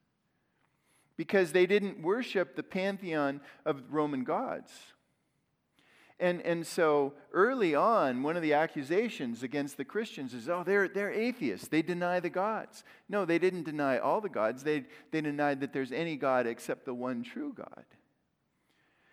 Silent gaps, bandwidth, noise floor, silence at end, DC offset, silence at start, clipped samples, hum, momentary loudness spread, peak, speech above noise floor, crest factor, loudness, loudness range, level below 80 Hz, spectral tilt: none; 16 kHz; -77 dBFS; 1.45 s; under 0.1%; 1.2 s; under 0.1%; none; 11 LU; -14 dBFS; 46 dB; 20 dB; -32 LUFS; 6 LU; -84 dBFS; -6 dB/octave